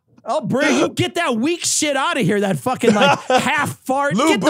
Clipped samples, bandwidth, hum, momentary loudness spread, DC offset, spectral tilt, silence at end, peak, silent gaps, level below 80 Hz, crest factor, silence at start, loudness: under 0.1%; 16 kHz; none; 6 LU; under 0.1%; -4 dB/octave; 0 s; 0 dBFS; none; -60 dBFS; 18 dB; 0.25 s; -17 LUFS